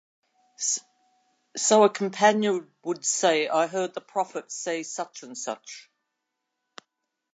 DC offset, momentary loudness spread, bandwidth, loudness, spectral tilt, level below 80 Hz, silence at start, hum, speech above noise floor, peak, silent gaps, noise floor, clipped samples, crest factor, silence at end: under 0.1%; 15 LU; 9.4 kHz; -25 LUFS; -2.5 dB/octave; -84 dBFS; 0.6 s; none; 56 dB; -6 dBFS; none; -82 dBFS; under 0.1%; 22 dB; 1.55 s